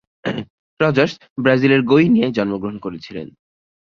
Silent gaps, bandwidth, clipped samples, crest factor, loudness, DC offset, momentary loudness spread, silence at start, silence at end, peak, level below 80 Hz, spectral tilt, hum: 0.50-0.77 s, 1.30-1.36 s; 7 kHz; under 0.1%; 18 dB; -17 LUFS; under 0.1%; 17 LU; 0.25 s; 0.55 s; 0 dBFS; -56 dBFS; -7.5 dB/octave; none